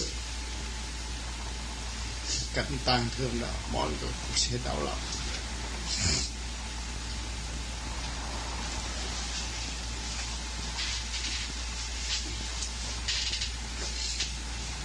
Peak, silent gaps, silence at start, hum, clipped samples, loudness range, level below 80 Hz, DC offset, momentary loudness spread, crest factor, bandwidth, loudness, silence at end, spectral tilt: -12 dBFS; none; 0 s; none; under 0.1%; 4 LU; -38 dBFS; under 0.1%; 9 LU; 22 dB; 10.5 kHz; -33 LUFS; 0 s; -2.5 dB/octave